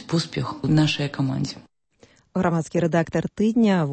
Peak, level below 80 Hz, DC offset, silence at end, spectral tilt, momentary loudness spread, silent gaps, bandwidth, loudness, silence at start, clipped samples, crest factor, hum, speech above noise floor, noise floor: -8 dBFS; -54 dBFS; under 0.1%; 0 s; -6.5 dB/octave; 9 LU; none; 8.8 kHz; -23 LUFS; 0 s; under 0.1%; 16 dB; none; 35 dB; -57 dBFS